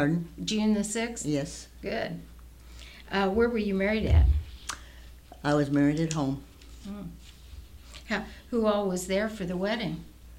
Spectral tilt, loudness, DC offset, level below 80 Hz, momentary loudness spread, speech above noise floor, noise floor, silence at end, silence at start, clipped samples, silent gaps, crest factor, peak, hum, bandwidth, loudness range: -5.5 dB/octave; -29 LUFS; under 0.1%; -36 dBFS; 22 LU; 21 dB; -48 dBFS; 0 s; 0 s; under 0.1%; none; 18 dB; -12 dBFS; none; 16 kHz; 5 LU